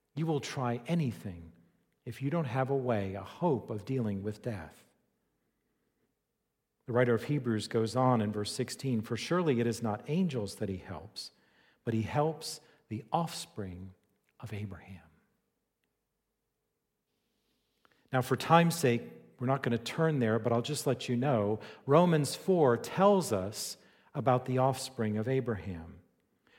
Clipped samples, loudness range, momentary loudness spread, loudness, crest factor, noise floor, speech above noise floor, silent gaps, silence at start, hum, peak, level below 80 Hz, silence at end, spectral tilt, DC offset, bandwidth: under 0.1%; 12 LU; 17 LU; -32 LUFS; 24 dB; -84 dBFS; 53 dB; none; 0.15 s; none; -8 dBFS; -68 dBFS; 0.6 s; -6 dB/octave; under 0.1%; 16.5 kHz